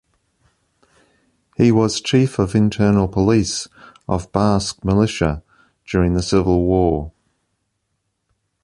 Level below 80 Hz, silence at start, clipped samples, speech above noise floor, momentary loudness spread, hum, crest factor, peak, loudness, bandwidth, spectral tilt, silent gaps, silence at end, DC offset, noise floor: -36 dBFS; 1.6 s; under 0.1%; 56 dB; 10 LU; none; 18 dB; 0 dBFS; -18 LUFS; 11.5 kHz; -6 dB/octave; none; 1.55 s; under 0.1%; -72 dBFS